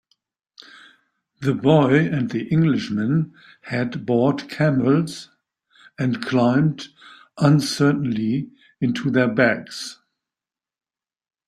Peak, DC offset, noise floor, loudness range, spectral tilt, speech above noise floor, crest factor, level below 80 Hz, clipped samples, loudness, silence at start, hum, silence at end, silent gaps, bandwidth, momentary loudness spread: -2 dBFS; under 0.1%; -90 dBFS; 2 LU; -7 dB/octave; 70 dB; 18 dB; -58 dBFS; under 0.1%; -20 LUFS; 0.6 s; none; 1.55 s; none; 12.5 kHz; 13 LU